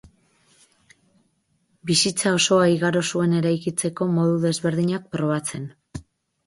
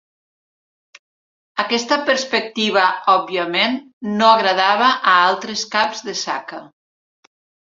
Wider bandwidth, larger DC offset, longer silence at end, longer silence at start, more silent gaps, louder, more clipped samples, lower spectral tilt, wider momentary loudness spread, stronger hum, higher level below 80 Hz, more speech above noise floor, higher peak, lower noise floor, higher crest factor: first, 11.5 kHz vs 7.8 kHz; neither; second, 0.45 s vs 1.05 s; first, 1.85 s vs 1.55 s; second, none vs 3.93-4.01 s; second, -21 LUFS vs -17 LUFS; neither; first, -4.5 dB/octave vs -2.5 dB/octave; first, 17 LU vs 12 LU; neither; first, -58 dBFS vs -68 dBFS; second, 47 dB vs over 73 dB; second, -6 dBFS vs 0 dBFS; second, -68 dBFS vs under -90 dBFS; about the same, 16 dB vs 18 dB